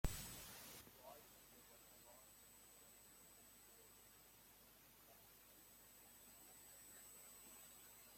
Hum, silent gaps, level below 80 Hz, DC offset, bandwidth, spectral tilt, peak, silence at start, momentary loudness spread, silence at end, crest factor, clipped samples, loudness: none; none; -62 dBFS; under 0.1%; 16.5 kHz; -3 dB/octave; -26 dBFS; 0.05 s; 9 LU; 0 s; 32 dB; under 0.1%; -60 LUFS